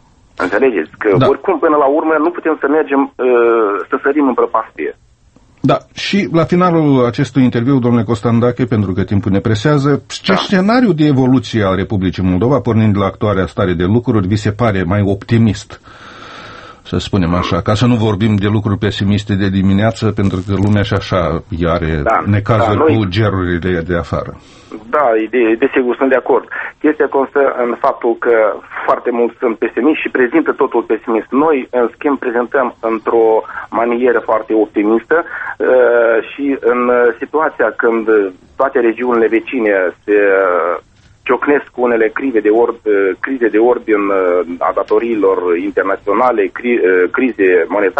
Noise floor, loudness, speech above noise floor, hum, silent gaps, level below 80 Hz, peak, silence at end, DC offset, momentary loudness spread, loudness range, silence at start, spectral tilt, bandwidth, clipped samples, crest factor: -48 dBFS; -13 LUFS; 35 dB; none; none; -40 dBFS; 0 dBFS; 0 s; under 0.1%; 6 LU; 2 LU; 0.4 s; -7.5 dB/octave; 8.6 kHz; under 0.1%; 14 dB